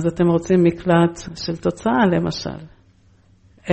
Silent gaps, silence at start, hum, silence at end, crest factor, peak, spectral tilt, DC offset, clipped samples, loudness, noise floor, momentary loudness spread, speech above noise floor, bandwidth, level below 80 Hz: none; 0 s; none; 0 s; 16 dB; -4 dBFS; -7 dB/octave; under 0.1%; under 0.1%; -19 LUFS; -54 dBFS; 14 LU; 35 dB; 8.6 kHz; -46 dBFS